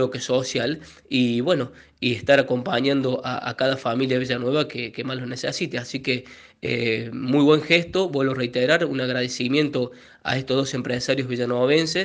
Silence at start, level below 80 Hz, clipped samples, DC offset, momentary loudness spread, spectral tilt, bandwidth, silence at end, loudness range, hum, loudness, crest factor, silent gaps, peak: 0 s; -60 dBFS; under 0.1%; under 0.1%; 9 LU; -5 dB/octave; 9.6 kHz; 0 s; 4 LU; none; -23 LUFS; 20 dB; none; -4 dBFS